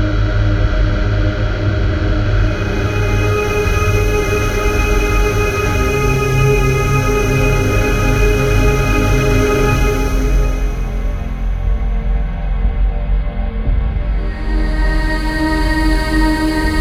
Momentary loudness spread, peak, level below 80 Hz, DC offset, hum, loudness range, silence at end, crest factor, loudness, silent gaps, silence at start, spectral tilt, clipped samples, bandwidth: 7 LU; 0 dBFS; -16 dBFS; 0.8%; none; 6 LU; 0 s; 14 dB; -16 LUFS; none; 0 s; -6 dB/octave; under 0.1%; 15.5 kHz